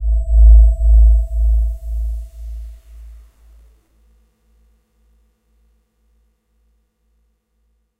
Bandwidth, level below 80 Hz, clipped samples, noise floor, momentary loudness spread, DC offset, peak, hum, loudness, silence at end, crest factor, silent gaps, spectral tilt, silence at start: 0.7 kHz; -16 dBFS; under 0.1%; -64 dBFS; 23 LU; under 0.1%; 0 dBFS; none; -14 LUFS; 4.95 s; 16 dB; none; -9.5 dB/octave; 0 s